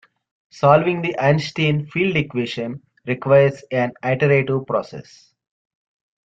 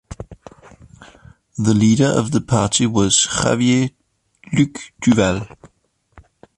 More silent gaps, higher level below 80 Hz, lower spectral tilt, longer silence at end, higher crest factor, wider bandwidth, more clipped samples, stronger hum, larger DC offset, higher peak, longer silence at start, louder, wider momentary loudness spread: neither; second, -58 dBFS vs -44 dBFS; first, -7 dB/octave vs -4.5 dB/octave; first, 1.25 s vs 0.35 s; about the same, 18 dB vs 18 dB; second, 7.8 kHz vs 11.5 kHz; neither; neither; neither; about the same, -2 dBFS vs -2 dBFS; first, 0.55 s vs 0.1 s; about the same, -19 LUFS vs -17 LUFS; second, 12 LU vs 18 LU